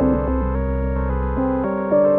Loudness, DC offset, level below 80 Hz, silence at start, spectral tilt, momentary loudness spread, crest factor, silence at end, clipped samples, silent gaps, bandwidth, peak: -21 LUFS; under 0.1%; -26 dBFS; 0 s; -13 dB/octave; 4 LU; 12 dB; 0 s; under 0.1%; none; 3.3 kHz; -6 dBFS